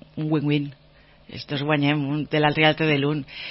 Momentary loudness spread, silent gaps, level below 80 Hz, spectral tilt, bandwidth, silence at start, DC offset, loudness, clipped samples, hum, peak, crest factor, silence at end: 13 LU; none; -56 dBFS; -10 dB/octave; 5.8 kHz; 0.15 s; under 0.1%; -22 LUFS; under 0.1%; none; -4 dBFS; 20 dB; 0 s